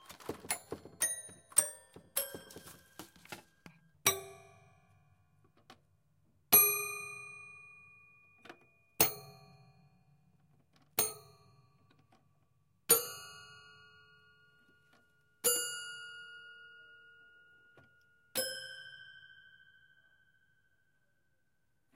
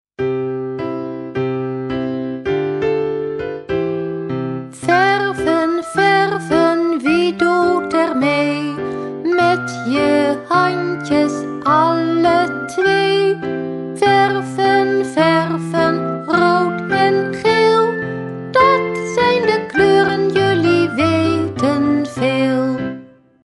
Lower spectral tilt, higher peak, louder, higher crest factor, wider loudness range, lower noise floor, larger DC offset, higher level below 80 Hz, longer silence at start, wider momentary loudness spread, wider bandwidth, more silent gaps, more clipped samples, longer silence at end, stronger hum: second, -0.5 dB/octave vs -6 dB/octave; second, -8 dBFS vs 0 dBFS; second, -32 LUFS vs -16 LUFS; first, 32 dB vs 16 dB; first, 13 LU vs 5 LU; first, -81 dBFS vs -37 dBFS; neither; second, -78 dBFS vs -50 dBFS; about the same, 0.1 s vs 0.2 s; first, 25 LU vs 9 LU; first, 16 kHz vs 11.5 kHz; neither; neither; first, 2.75 s vs 0.45 s; neither